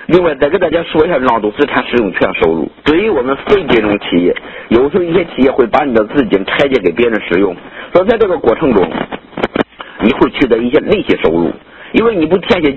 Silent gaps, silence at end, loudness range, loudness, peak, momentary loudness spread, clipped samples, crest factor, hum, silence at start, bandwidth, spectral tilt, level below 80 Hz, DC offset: none; 0 s; 1 LU; -12 LUFS; 0 dBFS; 6 LU; 0.3%; 12 dB; none; 0 s; 8 kHz; -7.5 dB/octave; -38 dBFS; under 0.1%